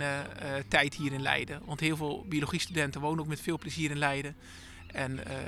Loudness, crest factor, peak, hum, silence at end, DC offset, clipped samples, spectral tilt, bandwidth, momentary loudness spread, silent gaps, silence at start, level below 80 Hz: -32 LUFS; 24 dB; -8 dBFS; none; 0 s; under 0.1%; under 0.1%; -4.5 dB/octave; 15 kHz; 10 LU; none; 0 s; -56 dBFS